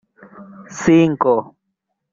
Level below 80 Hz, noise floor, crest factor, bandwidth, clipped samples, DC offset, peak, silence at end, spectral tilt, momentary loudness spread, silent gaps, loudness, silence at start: -54 dBFS; -75 dBFS; 18 dB; 7.6 kHz; under 0.1%; under 0.1%; -2 dBFS; 0.7 s; -6.5 dB/octave; 9 LU; none; -16 LUFS; 0.4 s